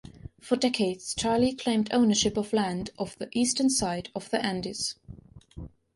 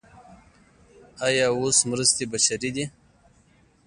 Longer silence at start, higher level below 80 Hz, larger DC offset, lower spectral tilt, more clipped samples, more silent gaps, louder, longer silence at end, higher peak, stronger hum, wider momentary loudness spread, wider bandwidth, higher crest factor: about the same, 0.15 s vs 0.15 s; first, -54 dBFS vs -60 dBFS; neither; first, -3.5 dB/octave vs -2 dB/octave; neither; neither; second, -27 LUFS vs -22 LUFS; second, 0.3 s vs 0.95 s; second, -10 dBFS vs -6 dBFS; neither; first, 19 LU vs 10 LU; about the same, 11.5 kHz vs 11.5 kHz; about the same, 18 dB vs 22 dB